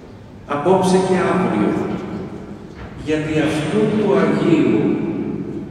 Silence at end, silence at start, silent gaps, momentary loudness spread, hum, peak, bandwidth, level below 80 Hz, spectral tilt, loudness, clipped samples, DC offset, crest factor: 0 s; 0 s; none; 16 LU; none; -2 dBFS; 12 kHz; -46 dBFS; -7 dB/octave; -18 LUFS; under 0.1%; under 0.1%; 16 dB